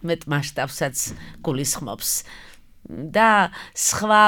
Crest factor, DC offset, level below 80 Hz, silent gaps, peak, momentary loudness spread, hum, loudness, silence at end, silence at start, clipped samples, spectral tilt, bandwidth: 20 dB; under 0.1%; -50 dBFS; none; -2 dBFS; 13 LU; none; -22 LUFS; 0 s; 0 s; under 0.1%; -3 dB/octave; 19.5 kHz